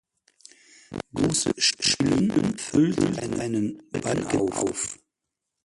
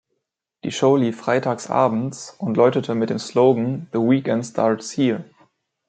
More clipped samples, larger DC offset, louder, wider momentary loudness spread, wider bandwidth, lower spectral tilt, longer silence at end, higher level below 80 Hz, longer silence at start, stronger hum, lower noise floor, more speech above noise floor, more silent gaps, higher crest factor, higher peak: neither; neither; second, -24 LUFS vs -20 LUFS; about the same, 11 LU vs 9 LU; first, 11.5 kHz vs 9.2 kHz; second, -4 dB/octave vs -6 dB/octave; about the same, 0.7 s vs 0.65 s; first, -52 dBFS vs -68 dBFS; first, 0.9 s vs 0.65 s; neither; first, -84 dBFS vs -77 dBFS; about the same, 59 dB vs 57 dB; neither; about the same, 18 dB vs 18 dB; second, -8 dBFS vs -2 dBFS